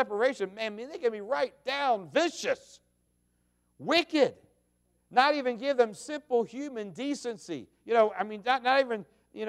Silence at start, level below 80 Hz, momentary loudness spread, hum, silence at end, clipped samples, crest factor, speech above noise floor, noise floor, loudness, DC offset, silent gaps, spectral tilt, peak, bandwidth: 0 s; -76 dBFS; 12 LU; 60 Hz at -65 dBFS; 0 s; under 0.1%; 20 dB; 44 dB; -73 dBFS; -29 LUFS; under 0.1%; none; -3.5 dB/octave; -10 dBFS; 13 kHz